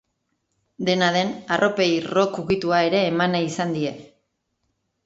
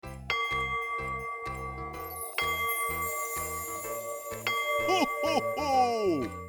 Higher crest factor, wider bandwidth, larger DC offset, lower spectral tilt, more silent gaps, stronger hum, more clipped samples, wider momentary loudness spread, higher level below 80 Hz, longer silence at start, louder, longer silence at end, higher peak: about the same, 18 dB vs 18 dB; second, 8 kHz vs over 20 kHz; neither; first, -5 dB/octave vs -3 dB/octave; neither; neither; neither; second, 6 LU vs 10 LU; second, -58 dBFS vs -52 dBFS; first, 0.8 s vs 0.05 s; first, -21 LUFS vs -30 LUFS; first, 1 s vs 0 s; first, -6 dBFS vs -14 dBFS